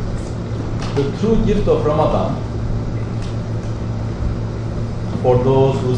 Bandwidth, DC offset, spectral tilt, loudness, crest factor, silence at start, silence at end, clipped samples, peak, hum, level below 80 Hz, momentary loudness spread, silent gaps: 9.4 kHz; under 0.1%; -8 dB/octave; -19 LUFS; 16 dB; 0 s; 0 s; under 0.1%; -2 dBFS; none; -26 dBFS; 9 LU; none